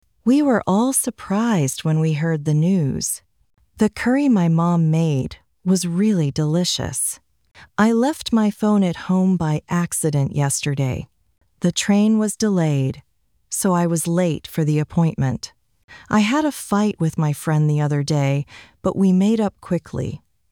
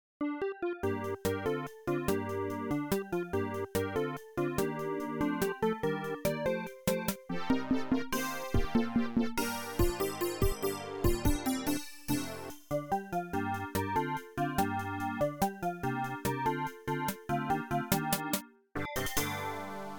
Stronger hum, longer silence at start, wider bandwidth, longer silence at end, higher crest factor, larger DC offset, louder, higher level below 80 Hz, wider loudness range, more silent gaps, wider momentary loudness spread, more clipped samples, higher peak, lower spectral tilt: neither; about the same, 0.25 s vs 0.2 s; about the same, 18.5 kHz vs 19 kHz; first, 0.35 s vs 0 s; second, 14 dB vs 20 dB; neither; first, -20 LUFS vs -34 LUFS; about the same, -50 dBFS vs -46 dBFS; about the same, 2 LU vs 2 LU; first, 15.84-15.88 s vs none; first, 8 LU vs 5 LU; neither; first, -4 dBFS vs -14 dBFS; about the same, -5.5 dB/octave vs -5 dB/octave